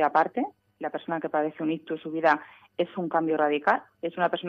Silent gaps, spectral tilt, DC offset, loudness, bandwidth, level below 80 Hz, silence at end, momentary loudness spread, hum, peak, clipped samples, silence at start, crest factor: none; -7 dB/octave; under 0.1%; -28 LUFS; 6.8 kHz; -76 dBFS; 0 s; 11 LU; none; -6 dBFS; under 0.1%; 0 s; 20 dB